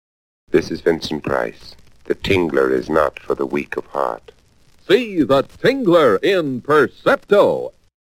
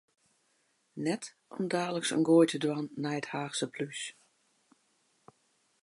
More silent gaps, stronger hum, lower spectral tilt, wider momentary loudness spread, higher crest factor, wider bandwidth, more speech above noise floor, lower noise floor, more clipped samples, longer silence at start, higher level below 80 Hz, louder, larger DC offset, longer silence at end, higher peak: neither; neither; first, -6 dB/octave vs -4.5 dB/octave; second, 10 LU vs 15 LU; about the same, 18 dB vs 20 dB; first, 16.5 kHz vs 11.5 kHz; second, 34 dB vs 43 dB; second, -51 dBFS vs -74 dBFS; neither; second, 0.5 s vs 0.95 s; first, -46 dBFS vs -84 dBFS; first, -18 LUFS vs -31 LUFS; neither; second, 0.3 s vs 1.7 s; first, 0 dBFS vs -12 dBFS